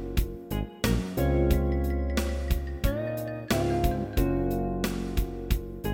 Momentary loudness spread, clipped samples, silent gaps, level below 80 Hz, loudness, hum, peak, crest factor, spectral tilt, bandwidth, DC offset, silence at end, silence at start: 7 LU; under 0.1%; none; -30 dBFS; -29 LUFS; none; -10 dBFS; 18 dB; -6.5 dB/octave; 17 kHz; under 0.1%; 0 s; 0 s